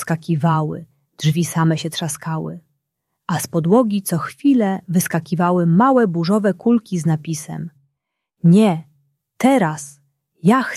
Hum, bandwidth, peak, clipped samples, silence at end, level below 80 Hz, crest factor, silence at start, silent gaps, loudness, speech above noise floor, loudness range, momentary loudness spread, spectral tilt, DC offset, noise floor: none; 14.5 kHz; -2 dBFS; under 0.1%; 0 s; -62 dBFS; 16 dB; 0 s; none; -18 LUFS; 60 dB; 4 LU; 13 LU; -6.5 dB/octave; under 0.1%; -77 dBFS